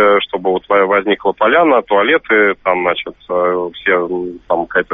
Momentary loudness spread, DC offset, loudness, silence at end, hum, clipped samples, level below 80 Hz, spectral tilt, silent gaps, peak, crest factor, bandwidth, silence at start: 8 LU; under 0.1%; -14 LUFS; 0 s; none; under 0.1%; -50 dBFS; -1.5 dB/octave; none; 0 dBFS; 14 dB; 3.9 kHz; 0 s